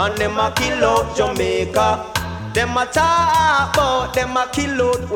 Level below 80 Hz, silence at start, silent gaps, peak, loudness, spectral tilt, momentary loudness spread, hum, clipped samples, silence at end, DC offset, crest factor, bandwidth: -36 dBFS; 0 s; none; -2 dBFS; -17 LUFS; -4 dB/octave; 6 LU; none; under 0.1%; 0 s; under 0.1%; 16 dB; 18.5 kHz